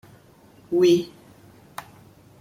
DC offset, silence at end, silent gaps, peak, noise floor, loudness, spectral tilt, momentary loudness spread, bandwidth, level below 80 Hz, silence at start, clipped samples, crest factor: under 0.1%; 0.6 s; none; -8 dBFS; -52 dBFS; -21 LUFS; -6 dB/octave; 22 LU; 15.5 kHz; -64 dBFS; 0.7 s; under 0.1%; 18 dB